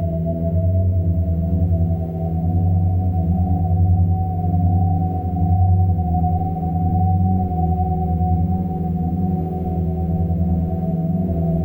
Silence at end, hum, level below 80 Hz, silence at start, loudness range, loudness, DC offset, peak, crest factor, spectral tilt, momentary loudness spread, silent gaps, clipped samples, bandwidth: 0 s; none; -32 dBFS; 0 s; 2 LU; -20 LUFS; under 0.1%; -6 dBFS; 12 dB; -13.5 dB/octave; 4 LU; none; under 0.1%; 1.4 kHz